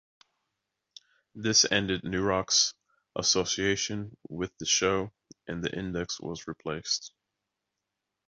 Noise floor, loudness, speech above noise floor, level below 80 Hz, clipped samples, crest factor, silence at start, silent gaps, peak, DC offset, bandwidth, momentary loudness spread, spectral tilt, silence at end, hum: -85 dBFS; -28 LUFS; 56 dB; -56 dBFS; under 0.1%; 22 dB; 1.35 s; none; -8 dBFS; under 0.1%; 8 kHz; 15 LU; -2.5 dB/octave; 1.2 s; none